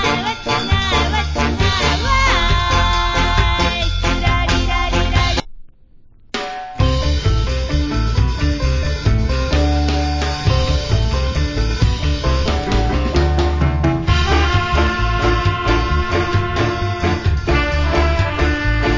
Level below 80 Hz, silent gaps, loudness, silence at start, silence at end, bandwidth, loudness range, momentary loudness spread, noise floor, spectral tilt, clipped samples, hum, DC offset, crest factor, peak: -20 dBFS; none; -17 LUFS; 0 s; 0 s; 7.6 kHz; 3 LU; 4 LU; -44 dBFS; -5.5 dB/octave; under 0.1%; none; under 0.1%; 14 dB; -2 dBFS